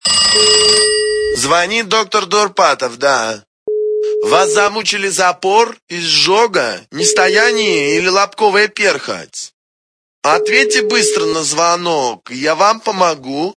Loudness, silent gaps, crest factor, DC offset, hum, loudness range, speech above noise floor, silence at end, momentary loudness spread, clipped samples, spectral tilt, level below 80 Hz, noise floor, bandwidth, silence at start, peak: -12 LUFS; 3.47-3.66 s, 5.82-5.87 s, 9.53-10.22 s; 14 dB; under 0.1%; none; 2 LU; over 77 dB; 0.05 s; 10 LU; under 0.1%; -1.5 dB/octave; -50 dBFS; under -90 dBFS; 11 kHz; 0.05 s; 0 dBFS